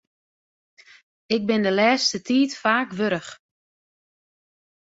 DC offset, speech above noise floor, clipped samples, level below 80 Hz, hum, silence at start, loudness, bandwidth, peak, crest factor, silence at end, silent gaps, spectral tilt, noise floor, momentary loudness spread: under 0.1%; over 69 dB; under 0.1%; -68 dBFS; none; 1.3 s; -21 LUFS; 8 kHz; -6 dBFS; 20 dB; 1.55 s; none; -4 dB/octave; under -90 dBFS; 8 LU